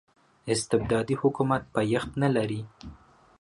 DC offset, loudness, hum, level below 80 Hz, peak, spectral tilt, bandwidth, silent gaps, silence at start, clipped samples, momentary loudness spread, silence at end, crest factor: under 0.1%; -27 LUFS; none; -52 dBFS; -10 dBFS; -6 dB/octave; 11.5 kHz; none; 0.45 s; under 0.1%; 18 LU; 0.45 s; 18 dB